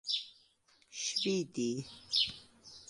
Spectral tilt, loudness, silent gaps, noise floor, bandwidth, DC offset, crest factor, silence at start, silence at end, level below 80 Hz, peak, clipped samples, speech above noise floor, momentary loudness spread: -3 dB/octave; -34 LUFS; none; -69 dBFS; 11.5 kHz; under 0.1%; 20 dB; 0.05 s; 0.05 s; -74 dBFS; -18 dBFS; under 0.1%; 34 dB; 20 LU